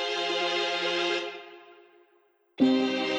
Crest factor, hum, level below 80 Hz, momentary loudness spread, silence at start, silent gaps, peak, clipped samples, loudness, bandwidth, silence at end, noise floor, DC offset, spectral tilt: 18 dB; none; -76 dBFS; 15 LU; 0 s; none; -10 dBFS; under 0.1%; -27 LUFS; 9 kHz; 0 s; -66 dBFS; under 0.1%; -3 dB/octave